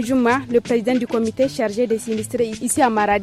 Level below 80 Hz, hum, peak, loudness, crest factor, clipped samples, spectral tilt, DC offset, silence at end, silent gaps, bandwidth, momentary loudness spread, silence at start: -52 dBFS; none; -4 dBFS; -20 LUFS; 14 dB; under 0.1%; -4.5 dB/octave; under 0.1%; 0 s; none; 14.5 kHz; 5 LU; 0 s